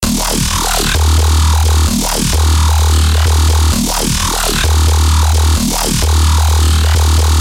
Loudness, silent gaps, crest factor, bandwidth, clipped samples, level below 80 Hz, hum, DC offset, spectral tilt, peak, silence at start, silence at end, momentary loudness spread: -12 LUFS; none; 8 dB; 16.5 kHz; under 0.1%; -14 dBFS; none; under 0.1%; -4 dB/octave; -2 dBFS; 0 s; 0 s; 2 LU